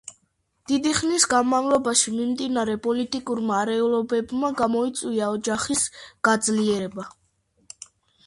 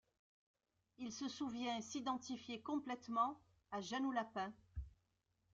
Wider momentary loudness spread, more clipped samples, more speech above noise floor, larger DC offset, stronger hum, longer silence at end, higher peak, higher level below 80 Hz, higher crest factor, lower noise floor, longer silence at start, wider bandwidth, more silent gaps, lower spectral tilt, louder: second, 8 LU vs 14 LU; neither; first, 47 dB vs 40 dB; neither; neither; first, 1.15 s vs 0.65 s; first, -4 dBFS vs -26 dBFS; first, -58 dBFS vs -64 dBFS; about the same, 20 dB vs 20 dB; second, -70 dBFS vs -84 dBFS; second, 0.05 s vs 1 s; first, 11.5 kHz vs 7.8 kHz; neither; about the same, -3 dB/octave vs -4 dB/octave; first, -23 LUFS vs -45 LUFS